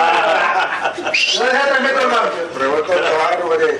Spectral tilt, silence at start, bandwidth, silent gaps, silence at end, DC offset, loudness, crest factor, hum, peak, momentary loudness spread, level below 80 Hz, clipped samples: -2 dB/octave; 0 s; 11.5 kHz; none; 0 s; under 0.1%; -15 LUFS; 14 dB; none; 0 dBFS; 5 LU; -62 dBFS; under 0.1%